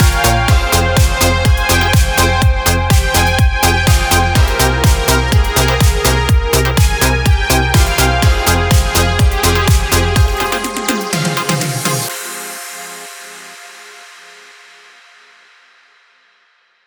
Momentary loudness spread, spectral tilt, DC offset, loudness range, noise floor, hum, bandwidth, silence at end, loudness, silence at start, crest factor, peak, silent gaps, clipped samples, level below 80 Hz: 13 LU; -4 dB/octave; under 0.1%; 10 LU; -55 dBFS; none; over 20 kHz; 2.8 s; -12 LUFS; 0 s; 12 dB; 0 dBFS; none; under 0.1%; -18 dBFS